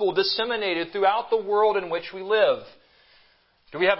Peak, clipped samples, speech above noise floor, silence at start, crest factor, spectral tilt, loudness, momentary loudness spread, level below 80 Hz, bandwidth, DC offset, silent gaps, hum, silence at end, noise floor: -6 dBFS; under 0.1%; 37 dB; 0 s; 18 dB; -7.5 dB/octave; -24 LUFS; 9 LU; -66 dBFS; 5.8 kHz; under 0.1%; none; none; 0 s; -61 dBFS